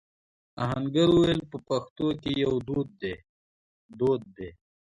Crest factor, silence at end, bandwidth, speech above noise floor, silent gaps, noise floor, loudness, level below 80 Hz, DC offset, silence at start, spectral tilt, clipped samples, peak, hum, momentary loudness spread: 16 dB; 0.35 s; 10.5 kHz; over 63 dB; 1.90-1.96 s, 3.29-3.89 s; under -90 dBFS; -27 LUFS; -54 dBFS; under 0.1%; 0.55 s; -7 dB/octave; under 0.1%; -12 dBFS; none; 17 LU